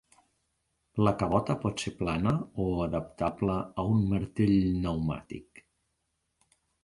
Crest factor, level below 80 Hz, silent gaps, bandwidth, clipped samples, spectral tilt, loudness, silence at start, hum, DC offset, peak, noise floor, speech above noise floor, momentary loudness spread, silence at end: 20 dB; -48 dBFS; none; 11.5 kHz; under 0.1%; -7.5 dB/octave; -30 LUFS; 0.95 s; none; under 0.1%; -10 dBFS; -79 dBFS; 50 dB; 8 LU; 1.4 s